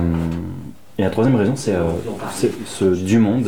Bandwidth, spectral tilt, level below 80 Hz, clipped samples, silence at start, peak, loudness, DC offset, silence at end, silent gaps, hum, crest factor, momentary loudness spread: 19 kHz; -7 dB/octave; -40 dBFS; under 0.1%; 0 s; -6 dBFS; -19 LUFS; 1%; 0 s; none; none; 12 dB; 11 LU